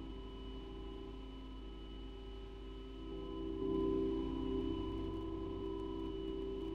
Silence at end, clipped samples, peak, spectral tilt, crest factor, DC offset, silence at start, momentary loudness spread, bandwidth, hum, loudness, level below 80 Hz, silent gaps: 0 s; under 0.1%; -26 dBFS; -8.5 dB/octave; 16 dB; under 0.1%; 0 s; 13 LU; 7.2 kHz; none; -43 LUFS; -50 dBFS; none